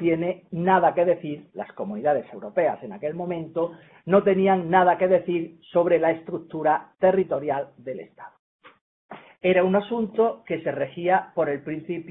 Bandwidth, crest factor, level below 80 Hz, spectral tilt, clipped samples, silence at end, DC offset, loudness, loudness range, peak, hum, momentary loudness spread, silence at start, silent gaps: 3.9 kHz; 20 dB; -66 dBFS; -11 dB/octave; under 0.1%; 0 s; under 0.1%; -23 LUFS; 5 LU; -4 dBFS; none; 13 LU; 0 s; 8.39-8.59 s, 8.81-9.09 s